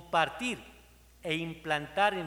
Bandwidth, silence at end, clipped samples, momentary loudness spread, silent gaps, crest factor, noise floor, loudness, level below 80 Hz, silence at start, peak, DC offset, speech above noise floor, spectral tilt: over 20 kHz; 0 s; under 0.1%; 10 LU; none; 20 dB; -58 dBFS; -32 LUFS; -60 dBFS; 0 s; -12 dBFS; under 0.1%; 26 dB; -4 dB/octave